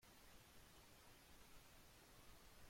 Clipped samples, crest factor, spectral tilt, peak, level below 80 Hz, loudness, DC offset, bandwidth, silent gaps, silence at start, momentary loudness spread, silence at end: under 0.1%; 14 dB; -3 dB/octave; -50 dBFS; -72 dBFS; -66 LUFS; under 0.1%; 16.5 kHz; none; 0 s; 0 LU; 0 s